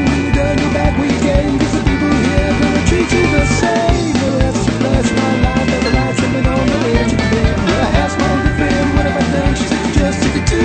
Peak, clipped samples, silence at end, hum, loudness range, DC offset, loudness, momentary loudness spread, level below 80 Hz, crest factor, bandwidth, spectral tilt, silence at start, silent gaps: 0 dBFS; under 0.1%; 0 s; none; 1 LU; under 0.1%; -14 LUFS; 2 LU; -22 dBFS; 12 dB; 9.2 kHz; -5.5 dB/octave; 0 s; none